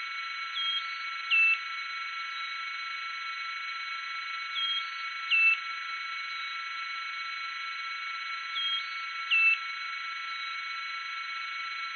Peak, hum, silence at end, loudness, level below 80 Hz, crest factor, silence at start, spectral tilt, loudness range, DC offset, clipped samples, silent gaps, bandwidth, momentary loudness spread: -16 dBFS; none; 0 s; -30 LUFS; under -90 dBFS; 18 dB; 0 s; 8 dB/octave; 4 LU; under 0.1%; under 0.1%; none; 6.6 kHz; 12 LU